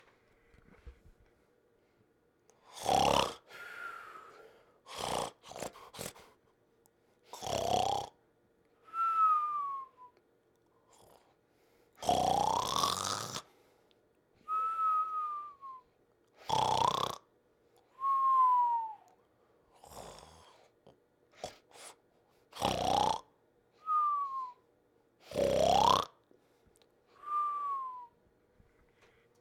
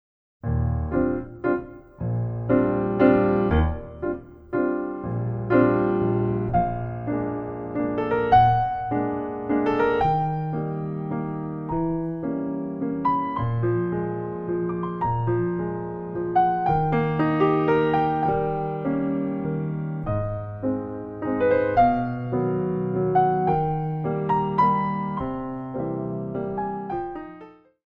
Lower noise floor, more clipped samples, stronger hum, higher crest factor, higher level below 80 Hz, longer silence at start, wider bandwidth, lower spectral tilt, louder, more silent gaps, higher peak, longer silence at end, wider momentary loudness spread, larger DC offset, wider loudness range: first, -71 dBFS vs -47 dBFS; neither; neither; first, 24 dB vs 18 dB; second, -62 dBFS vs -40 dBFS; first, 0.85 s vs 0.45 s; first, 19 kHz vs 5.6 kHz; second, -3 dB/octave vs -10.5 dB/octave; second, -33 LUFS vs -24 LUFS; neither; second, -12 dBFS vs -4 dBFS; first, 1.35 s vs 0.4 s; first, 23 LU vs 10 LU; neither; first, 9 LU vs 4 LU